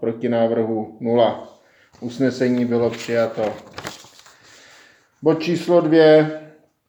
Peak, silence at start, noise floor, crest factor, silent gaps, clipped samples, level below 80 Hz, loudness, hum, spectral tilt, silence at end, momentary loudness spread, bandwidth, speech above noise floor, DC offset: -2 dBFS; 0 s; -51 dBFS; 18 dB; none; under 0.1%; -66 dBFS; -19 LUFS; none; -6.5 dB/octave; 0.4 s; 20 LU; 19.5 kHz; 33 dB; under 0.1%